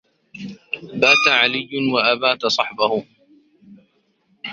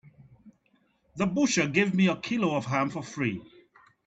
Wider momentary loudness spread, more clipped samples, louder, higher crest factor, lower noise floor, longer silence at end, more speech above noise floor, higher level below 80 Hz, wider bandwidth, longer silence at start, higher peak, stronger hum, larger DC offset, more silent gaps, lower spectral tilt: first, 22 LU vs 8 LU; neither; first, -17 LUFS vs -27 LUFS; about the same, 20 dB vs 20 dB; second, -63 dBFS vs -69 dBFS; second, 0 s vs 0.6 s; about the same, 45 dB vs 42 dB; about the same, -64 dBFS vs -64 dBFS; about the same, 7.8 kHz vs 8.2 kHz; first, 0.35 s vs 0.2 s; first, 0 dBFS vs -10 dBFS; neither; neither; neither; second, -3 dB/octave vs -5 dB/octave